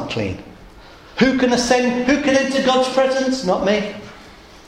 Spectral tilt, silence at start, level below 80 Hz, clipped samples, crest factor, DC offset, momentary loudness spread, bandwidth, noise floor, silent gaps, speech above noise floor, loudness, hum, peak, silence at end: -4 dB/octave; 0 s; -46 dBFS; under 0.1%; 18 dB; under 0.1%; 14 LU; 12.5 kHz; -42 dBFS; none; 25 dB; -17 LUFS; none; -2 dBFS; 0.3 s